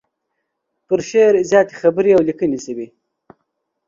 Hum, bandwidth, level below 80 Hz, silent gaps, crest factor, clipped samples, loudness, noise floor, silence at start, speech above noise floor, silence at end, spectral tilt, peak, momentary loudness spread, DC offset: none; 7.6 kHz; -58 dBFS; none; 18 dB; under 0.1%; -15 LUFS; -74 dBFS; 0.9 s; 60 dB; 1.05 s; -5.5 dB/octave; 0 dBFS; 15 LU; under 0.1%